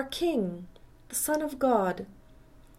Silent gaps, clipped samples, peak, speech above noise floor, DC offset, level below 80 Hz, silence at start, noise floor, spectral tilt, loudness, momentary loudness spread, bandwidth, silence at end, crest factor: none; under 0.1%; -10 dBFS; 25 dB; under 0.1%; -56 dBFS; 0 s; -54 dBFS; -4 dB/octave; -29 LUFS; 15 LU; 16.5 kHz; 0.15 s; 20 dB